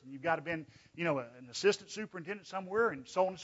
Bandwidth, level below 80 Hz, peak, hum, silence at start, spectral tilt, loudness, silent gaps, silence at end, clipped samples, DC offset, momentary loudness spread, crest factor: 7.6 kHz; -76 dBFS; -16 dBFS; none; 0.05 s; -3 dB/octave; -35 LUFS; none; 0 s; under 0.1%; under 0.1%; 11 LU; 18 dB